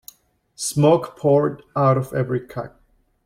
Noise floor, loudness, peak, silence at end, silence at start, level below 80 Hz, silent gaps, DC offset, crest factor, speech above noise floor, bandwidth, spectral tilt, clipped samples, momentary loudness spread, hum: -56 dBFS; -20 LUFS; -4 dBFS; 0.6 s; 0.6 s; -58 dBFS; none; under 0.1%; 18 dB; 37 dB; 16.5 kHz; -6.5 dB/octave; under 0.1%; 14 LU; none